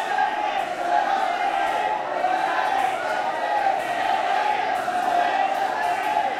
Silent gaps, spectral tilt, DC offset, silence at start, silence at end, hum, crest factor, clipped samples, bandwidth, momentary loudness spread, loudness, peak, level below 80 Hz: none; -2.5 dB/octave; under 0.1%; 0 s; 0 s; none; 14 dB; under 0.1%; 15.5 kHz; 3 LU; -23 LUFS; -8 dBFS; -64 dBFS